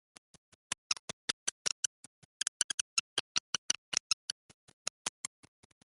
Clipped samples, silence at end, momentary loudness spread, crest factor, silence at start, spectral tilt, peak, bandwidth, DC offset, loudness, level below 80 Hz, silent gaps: under 0.1%; 0.85 s; 10 LU; 30 dB; 0.9 s; 1.5 dB/octave; -10 dBFS; 12 kHz; under 0.1%; -36 LUFS; -80 dBFS; 0.99-1.65 s, 1.72-2.40 s, 2.48-3.69 s, 3.78-3.92 s, 4.00-5.05 s